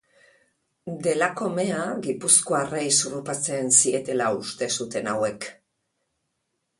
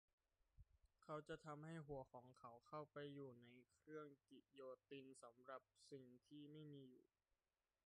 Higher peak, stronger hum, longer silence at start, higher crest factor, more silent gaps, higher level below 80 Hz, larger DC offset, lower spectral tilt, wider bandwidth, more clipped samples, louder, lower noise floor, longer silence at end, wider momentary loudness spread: first, -2 dBFS vs -42 dBFS; neither; first, 0.85 s vs 0.55 s; first, 24 dB vs 18 dB; neither; first, -68 dBFS vs -84 dBFS; neither; second, -2.5 dB/octave vs -6 dB/octave; about the same, 11.5 kHz vs 10.5 kHz; neither; first, -23 LUFS vs -60 LUFS; second, -77 dBFS vs under -90 dBFS; first, 1.25 s vs 0.85 s; about the same, 11 LU vs 9 LU